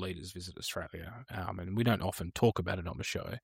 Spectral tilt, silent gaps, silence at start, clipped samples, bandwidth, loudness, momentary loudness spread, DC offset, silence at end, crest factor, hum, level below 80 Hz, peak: -5.5 dB/octave; none; 0 s; under 0.1%; 16 kHz; -35 LUFS; 13 LU; under 0.1%; 0.05 s; 20 dB; none; -54 dBFS; -16 dBFS